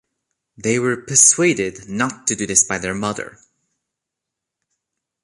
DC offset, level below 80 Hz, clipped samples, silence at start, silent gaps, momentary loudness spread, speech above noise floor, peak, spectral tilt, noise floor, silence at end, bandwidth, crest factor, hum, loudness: under 0.1%; -54 dBFS; under 0.1%; 0.6 s; none; 14 LU; 64 dB; 0 dBFS; -2.5 dB/octave; -83 dBFS; 1.95 s; 11.5 kHz; 22 dB; none; -16 LUFS